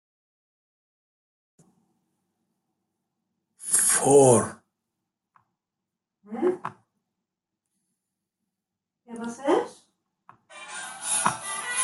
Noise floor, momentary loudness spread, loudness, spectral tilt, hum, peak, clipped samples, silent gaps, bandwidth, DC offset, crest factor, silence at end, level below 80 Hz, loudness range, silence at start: -86 dBFS; 22 LU; -22 LUFS; -3.5 dB/octave; none; -6 dBFS; under 0.1%; none; 12.5 kHz; under 0.1%; 22 dB; 0 s; -72 dBFS; 13 LU; 3.6 s